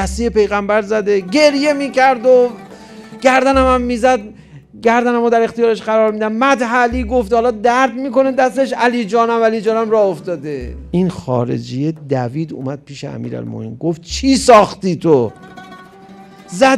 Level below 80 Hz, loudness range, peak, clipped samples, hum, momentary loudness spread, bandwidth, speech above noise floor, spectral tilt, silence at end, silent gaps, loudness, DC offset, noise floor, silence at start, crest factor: -36 dBFS; 6 LU; 0 dBFS; under 0.1%; none; 14 LU; 13 kHz; 25 dB; -5.5 dB/octave; 0 s; none; -14 LUFS; under 0.1%; -39 dBFS; 0 s; 14 dB